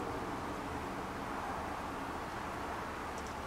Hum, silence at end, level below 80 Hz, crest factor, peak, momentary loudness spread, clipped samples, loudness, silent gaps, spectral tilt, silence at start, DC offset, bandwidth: none; 0 s; -54 dBFS; 14 dB; -28 dBFS; 1 LU; under 0.1%; -41 LUFS; none; -5 dB/octave; 0 s; under 0.1%; 16 kHz